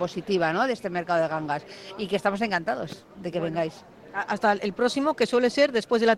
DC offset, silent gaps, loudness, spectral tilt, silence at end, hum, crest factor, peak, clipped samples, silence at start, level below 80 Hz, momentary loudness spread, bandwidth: under 0.1%; none; -26 LUFS; -5 dB/octave; 0 s; none; 18 dB; -8 dBFS; under 0.1%; 0 s; -64 dBFS; 11 LU; 12.5 kHz